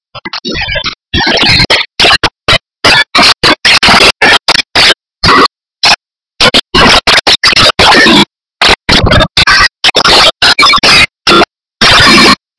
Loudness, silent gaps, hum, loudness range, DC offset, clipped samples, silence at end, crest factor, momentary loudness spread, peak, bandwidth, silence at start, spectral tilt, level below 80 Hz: -4 LUFS; none; none; 2 LU; under 0.1%; 5%; 0.25 s; 6 dB; 8 LU; 0 dBFS; 11 kHz; 0.15 s; -2.5 dB/octave; -24 dBFS